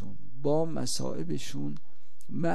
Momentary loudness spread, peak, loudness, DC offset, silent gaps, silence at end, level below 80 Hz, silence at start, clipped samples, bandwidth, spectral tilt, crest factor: 13 LU; -14 dBFS; -33 LUFS; 5%; none; 0 s; -64 dBFS; 0 s; under 0.1%; 14.5 kHz; -5 dB/octave; 18 dB